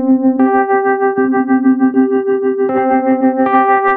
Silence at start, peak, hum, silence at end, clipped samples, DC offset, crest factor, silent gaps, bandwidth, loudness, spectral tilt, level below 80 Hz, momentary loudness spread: 0 s; 0 dBFS; none; 0 s; under 0.1%; under 0.1%; 10 dB; none; 3.7 kHz; -12 LUFS; -10 dB/octave; -60 dBFS; 3 LU